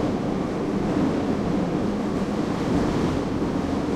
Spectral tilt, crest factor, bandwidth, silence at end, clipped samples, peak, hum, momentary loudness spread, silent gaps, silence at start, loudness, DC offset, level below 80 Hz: -7 dB/octave; 14 dB; 13 kHz; 0 s; under 0.1%; -10 dBFS; none; 3 LU; none; 0 s; -25 LUFS; under 0.1%; -42 dBFS